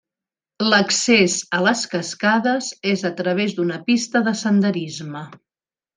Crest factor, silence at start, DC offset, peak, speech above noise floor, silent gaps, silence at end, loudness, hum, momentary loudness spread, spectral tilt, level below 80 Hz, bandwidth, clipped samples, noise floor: 18 dB; 0.6 s; under 0.1%; -2 dBFS; over 71 dB; none; 0.6 s; -19 LUFS; none; 12 LU; -3.5 dB/octave; -66 dBFS; 10 kHz; under 0.1%; under -90 dBFS